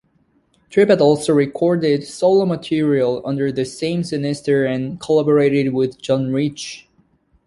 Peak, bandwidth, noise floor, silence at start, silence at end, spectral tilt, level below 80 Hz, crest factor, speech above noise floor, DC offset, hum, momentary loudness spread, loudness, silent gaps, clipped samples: -2 dBFS; 11.5 kHz; -60 dBFS; 0.7 s; 0.65 s; -6.5 dB/octave; -56 dBFS; 16 dB; 43 dB; under 0.1%; none; 8 LU; -18 LUFS; none; under 0.1%